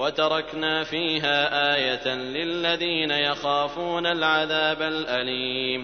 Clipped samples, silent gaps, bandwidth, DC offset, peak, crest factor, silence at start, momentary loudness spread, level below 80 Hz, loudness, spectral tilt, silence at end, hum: under 0.1%; none; 6.6 kHz; under 0.1%; -8 dBFS; 16 dB; 0 s; 5 LU; -56 dBFS; -23 LUFS; -4.5 dB/octave; 0 s; none